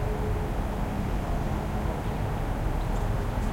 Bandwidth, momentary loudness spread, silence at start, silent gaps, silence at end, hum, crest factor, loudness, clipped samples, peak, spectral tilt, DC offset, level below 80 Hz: 16.5 kHz; 1 LU; 0 s; none; 0 s; none; 12 dB; -31 LUFS; under 0.1%; -16 dBFS; -7 dB/octave; under 0.1%; -32 dBFS